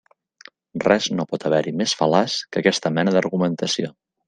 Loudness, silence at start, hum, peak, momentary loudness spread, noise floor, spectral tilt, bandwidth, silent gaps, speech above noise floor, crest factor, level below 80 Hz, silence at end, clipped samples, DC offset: -21 LUFS; 0.75 s; none; -2 dBFS; 6 LU; -49 dBFS; -4.5 dB/octave; 9.8 kHz; none; 29 dB; 20 dB; -62 dBFS; 0.4 s; under 0.1%; under 0.1%